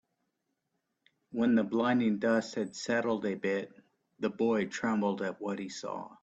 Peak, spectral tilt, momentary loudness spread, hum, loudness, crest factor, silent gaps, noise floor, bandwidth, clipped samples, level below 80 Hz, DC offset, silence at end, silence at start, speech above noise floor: -16 dBFS; -5.5 dB/octave; 10 LU; none; -32 LUFS; 16 dB; none; -82 dBFS; 8.4 kHz; under 0.1%; -74 dBFS; under 0.1%; 0.1 s; 1.3 s; 51 dB